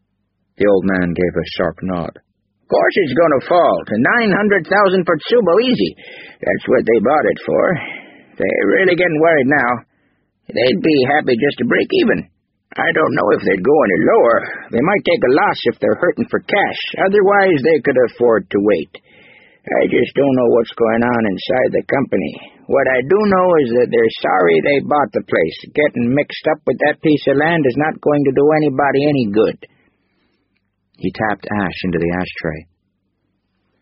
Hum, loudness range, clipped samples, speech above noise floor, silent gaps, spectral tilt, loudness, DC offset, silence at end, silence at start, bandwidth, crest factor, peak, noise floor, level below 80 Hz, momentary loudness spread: none; 3 LU; under 0.1%; 53 dB; none; -4.5 dB/octave; -15 LUFS; under 0.1%; 1.2 s; 0.6 s; 5.8 kHz; 16 dB; 0 dBFS; -68 dBFS; -50 dBFS; 8 LU